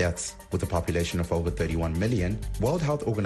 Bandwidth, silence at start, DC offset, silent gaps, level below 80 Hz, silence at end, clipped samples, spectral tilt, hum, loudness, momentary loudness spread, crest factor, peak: 12.5 kHz; 0 s; under 0.1%; none; -38 dBFS; 0 s; under 0.1%; -6 dB/octave; none; -28 LUFS; 4 LU; 14 dB; -12 dBFS